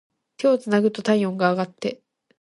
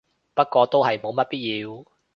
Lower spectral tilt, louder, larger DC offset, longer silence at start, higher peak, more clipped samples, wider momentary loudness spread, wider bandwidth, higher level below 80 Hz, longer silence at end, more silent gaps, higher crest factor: about the same, -6.5 dB/octave vs -6.5 dB/octave; about the same, -22 LUFS vs -22 LUFS; neither; about the same, 0.4 s vs 0.35 s; about the same, -6 dBFS vs -4 dBFS; neither; second, 9 LU vs 14 LU; first, 11.5 kHz vs 6.6 kHz; about the same, -70 dBFS vs -68 dBFS; about the same, 0.45 s vs 0.35 s; neither; about the same, 18 dB vs 20 dB